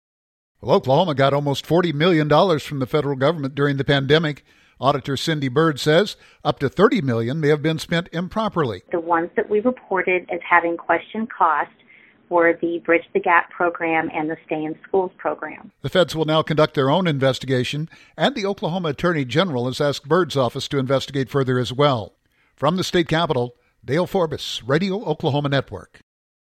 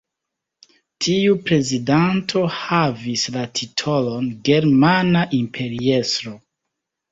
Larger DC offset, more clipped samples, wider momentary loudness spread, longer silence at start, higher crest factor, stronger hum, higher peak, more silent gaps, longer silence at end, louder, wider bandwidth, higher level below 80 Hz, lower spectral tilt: neither; neither; about the same, 9 LU vs 9 LU; second, 0.6 s vs 1 s; about the same, 20 dB vs 18 dB; neither; about the same, 0 dBFS vs -2 dBFS; neither; about the same, 0.7 s vs 0.75 s; about the same, -20 LUFS vs -19 LUFS; first, 14.5 kHz vs 7.8 kHz; about the same, -52 dBFS vs -54 dBFS; about the same, -6 dB/octave vs -5 dB/octave